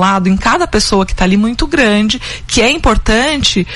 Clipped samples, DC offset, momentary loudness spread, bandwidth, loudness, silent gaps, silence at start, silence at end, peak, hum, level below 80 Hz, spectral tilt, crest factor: under 0.1%; under 0.1%; 3 LU; 12 kHz; -11 LUFS; none; 0 s; 0 s; 0 dBFS; none; -22 dBFS; -4 dB/octave; 12 dB